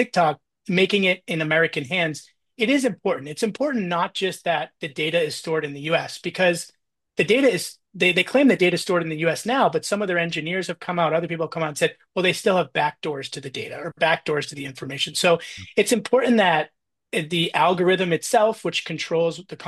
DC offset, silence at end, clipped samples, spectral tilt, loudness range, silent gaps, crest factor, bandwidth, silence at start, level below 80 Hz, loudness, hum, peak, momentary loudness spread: under 0.1%; 0 s; under 0.1%; -4.5 dB/octave; 4 LU; none; 18 dB; 12.5 kHz; 0 s; -68 dBFS; -22 LUFS; none; -6 dBFS; 11 LU